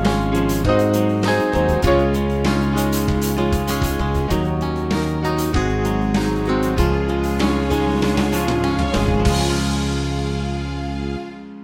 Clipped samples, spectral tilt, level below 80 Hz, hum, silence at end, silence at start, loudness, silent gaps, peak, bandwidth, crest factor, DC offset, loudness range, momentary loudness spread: under 0.1%; -6 dB/octave; -26 dBFS; none; 0 s; 0 s; -19 LUFS; none; -2 dBFS; 17 kHz; 16 dB; under 0.1%; 2 LU; 6 LU